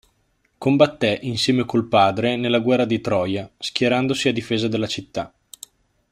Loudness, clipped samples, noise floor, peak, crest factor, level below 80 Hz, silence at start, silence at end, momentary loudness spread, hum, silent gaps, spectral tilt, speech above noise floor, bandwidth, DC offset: -20 LUFS; under 0.1%; -66 dBFS; -2 dBFS; 20 dB; -58 dBFS; 0.6 s; 0.85 s; 13 LU; none; none; -5.5 dB/octave; 46 dB; 15 kHz; under 0.1%